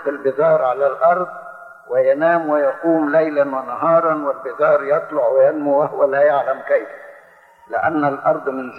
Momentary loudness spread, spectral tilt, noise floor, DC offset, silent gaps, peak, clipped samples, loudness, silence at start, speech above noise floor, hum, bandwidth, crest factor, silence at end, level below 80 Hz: 7 LU; -8.5 dB/octave; -47 dBFS; under 0.1%; none; -4 dBFS; under 0.1%; -17 LUFS; 0 s; 31 dB; none; 4.4 kHz; 14 dB; 0 s; -70 dBFS